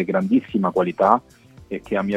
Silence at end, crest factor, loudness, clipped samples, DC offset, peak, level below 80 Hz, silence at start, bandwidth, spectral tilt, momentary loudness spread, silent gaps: 0 s; 20 dB; -20 LUFS; under 0.1%; under 0.1%; 0 dBFS; -54 dBFS; 0 s; 9.8 kHz; -8.5 dB/octave; 12 LU; none